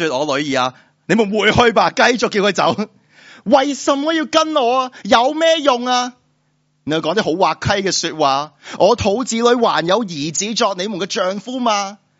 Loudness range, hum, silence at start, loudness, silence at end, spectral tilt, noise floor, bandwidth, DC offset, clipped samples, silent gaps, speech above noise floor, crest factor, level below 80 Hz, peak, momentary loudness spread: 2 LU; none; 0 s; -16 LUFS; 0.25 s; -2.5 dB/octave; -63 dBFS; 8 kHz; under 0.1%; under 0.1%; none; 47 dB; 16 dB; -50 dBFS; 0 dBFS; 7 LU